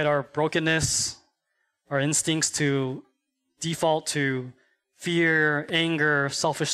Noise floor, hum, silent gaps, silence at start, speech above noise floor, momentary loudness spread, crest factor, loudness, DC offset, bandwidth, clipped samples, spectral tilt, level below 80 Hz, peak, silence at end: -76 dBFS; none; none; 0 s; 52 dB; 10 LU; 16 dB; -24 LUFS; under 0.1%; 15.5 kHz; under 0.1%; -3.5 dB/octave; -56 dBFS; -10 dBFS; 0 s